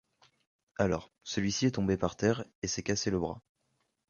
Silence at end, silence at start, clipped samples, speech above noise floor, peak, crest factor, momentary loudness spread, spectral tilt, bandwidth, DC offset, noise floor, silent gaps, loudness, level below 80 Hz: 0.7 s; 0.8 s; under 0.1%; 47 dB; -12 dBFS; 20 dB; 8 LU; -5 dB/octave; 7.4 kHz; under 0.1%; -78 dBFS; 2.55-2.62 s; -32 LUFS; -54 dBFS